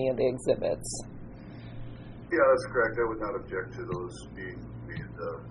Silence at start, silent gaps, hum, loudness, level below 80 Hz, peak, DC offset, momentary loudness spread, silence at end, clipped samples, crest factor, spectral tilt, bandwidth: 0 s; none; none; -30 LUFS; -50 dBFS; -10 dBFS; under 0.1%; 20 LU; 0 s; under 0.1%; 20 dB; -5.5 dB/octave; 11 kHz